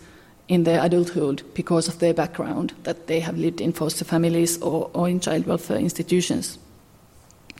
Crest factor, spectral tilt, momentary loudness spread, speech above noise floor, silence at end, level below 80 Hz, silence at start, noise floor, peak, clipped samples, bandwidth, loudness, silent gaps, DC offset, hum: 16 dB; -5.5 dB/octave; 8 LU; 29 dB; 1 s; -56 dBFS; 0 s; -52 dBFS; -8 dBFS; under 0.1%; 16 kHz; -23 LUFS; none; under 0.1%; none